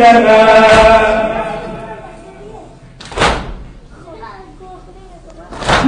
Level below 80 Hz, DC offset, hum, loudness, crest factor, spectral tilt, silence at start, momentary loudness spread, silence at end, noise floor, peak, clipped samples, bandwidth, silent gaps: -30 dBFS; under 0.1%; none; -9 LUFS; 12 dB; -4.5 dB/octave; 0 s; 26 LU; 0 s; -35 dBFS; 0 dBFS; under 0.1%; 10.5 kHz; none